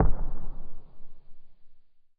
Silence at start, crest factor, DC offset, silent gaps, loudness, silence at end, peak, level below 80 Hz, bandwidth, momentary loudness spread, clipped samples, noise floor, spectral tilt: 0 s; 18 dB; under 0.1%; none; -36 LUFS; 0.4 s; -6 dBFS; -32 dBFS; 1.6 kHz; 25 LU; under 0.1%; -48 dBFS; -11 dB/octave